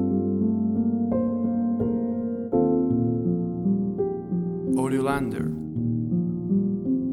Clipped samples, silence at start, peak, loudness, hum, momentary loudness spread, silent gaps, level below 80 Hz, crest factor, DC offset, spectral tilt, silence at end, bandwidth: under 0.1%; 0 s; -10 dBFS; -25 LUFS; none; 5 LU; none; -52 dBFS; 14 dB; under 0.1%; -9 dB/octave; 0 s; 12 kHz